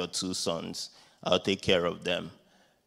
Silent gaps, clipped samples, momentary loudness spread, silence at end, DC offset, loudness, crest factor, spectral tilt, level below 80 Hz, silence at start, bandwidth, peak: none; under 0.1%; 12 LU; 0.55 s; under 0.1%; -30 LUFS; 24 dB; -3.5 dB/octave; -60 dBFS; 0 s; 16 kHz; -8 dBFS